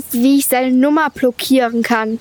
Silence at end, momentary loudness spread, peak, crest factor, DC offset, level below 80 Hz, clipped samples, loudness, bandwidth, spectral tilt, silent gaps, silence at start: 0 s; 4 LU; -4 dBFS; 10 dB; under 0.1%; -56 dBFS; under 0.1%; -14 LUFS; over 20 kHz; -3.5 dB/octave; none; 0 s